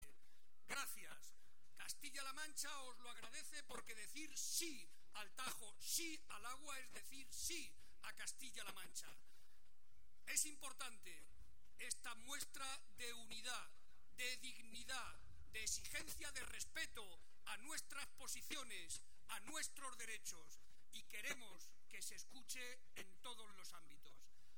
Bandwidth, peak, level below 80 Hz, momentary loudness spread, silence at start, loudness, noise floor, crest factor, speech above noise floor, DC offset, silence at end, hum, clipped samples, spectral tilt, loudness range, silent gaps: 16.5 kHz; -26 dBFS; -74 dBFS; 15 LU; 0 s; -50 LUFS; -79 dBFS; 26 dB; 26 dB; 0.4%; 0.05 s; none; under 0.1%; 0 dB/octave; 4 LU; none